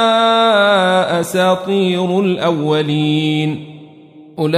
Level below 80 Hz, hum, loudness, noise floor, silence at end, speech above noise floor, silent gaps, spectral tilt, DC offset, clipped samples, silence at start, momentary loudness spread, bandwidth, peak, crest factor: -62 dBFS; none; -14 LUFS; -40 dBFS; 0 s; 26 dB; none; -5.5 dB/octave; under 0.1%; under 0.1%; 0 s; 8 LU; 15.5 kHz; -2 dBFS; 12 dB